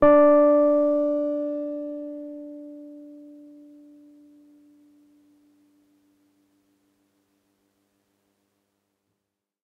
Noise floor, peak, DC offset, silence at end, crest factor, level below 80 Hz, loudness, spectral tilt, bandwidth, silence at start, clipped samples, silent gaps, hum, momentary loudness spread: -82 dBFS; -6 dBFS; under 0.1%; 6.55 s; 20 dB; -60 dBFS; -21 LUFS; -8.5 dB/octave; 3.4 kHz; 0 s; under 0.1%; none; none; 28 LU